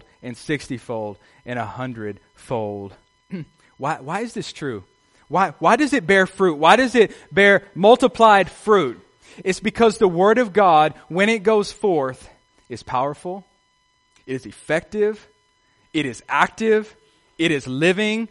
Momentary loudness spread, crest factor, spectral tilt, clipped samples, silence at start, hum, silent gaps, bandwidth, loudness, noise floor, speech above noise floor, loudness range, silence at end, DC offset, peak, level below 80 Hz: 19 LU; 20 dB; -5 dB/octave; under 0.1%; 0.25 s; none; none; 11.5 kHz; -19 LUFS; -64 dBFS; 45 dB; 14 LU; 0.05 s; under 0.1%; 0 dBFS; -56 dBFS